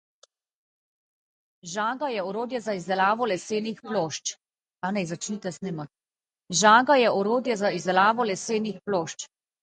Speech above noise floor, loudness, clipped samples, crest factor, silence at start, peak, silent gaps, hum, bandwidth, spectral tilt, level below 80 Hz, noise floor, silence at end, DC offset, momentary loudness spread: over 65 dB; -25 LUFS; under 0.1%; 22 dB; 1.65 s; -4 dBFS; none; none; 9.6 kHz; -3.5 dB/octave; -74 dBFS; under -90 dBFS; 0.35 s; under 0.1%; 15 LU